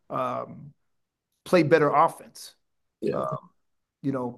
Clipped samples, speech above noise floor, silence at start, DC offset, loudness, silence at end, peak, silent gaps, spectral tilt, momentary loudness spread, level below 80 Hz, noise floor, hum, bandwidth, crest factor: under 0.1%; 54 dB; 0.1 s; under 0.1%; -25 LUFS; 0 s; -4 dBFS; none; -6.5 dB/octave; 23 LU; -74 dBFS; -79 dBFS; none; 12.5 kHz; 22 dB